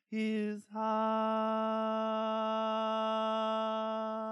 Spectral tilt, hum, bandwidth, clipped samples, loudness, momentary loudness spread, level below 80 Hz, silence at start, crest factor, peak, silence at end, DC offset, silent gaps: -6 dB/octave; none; 10.5 kHz; under 0.1%; -34 LUFS; 4 LU; under -90 dBFS; 0.1 s; 10 dB; -22 dBFS; 0 s; under 0.1%; none